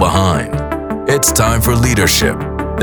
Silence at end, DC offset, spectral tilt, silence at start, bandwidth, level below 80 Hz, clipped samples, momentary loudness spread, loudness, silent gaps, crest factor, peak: 0 s; under 0.1%; -4 dB/octave; 0 s; over 20 kHz; -24 dBFS; under 0.1%; 9 LU; -13 LUFS; none; 12 dB; 0 dBFS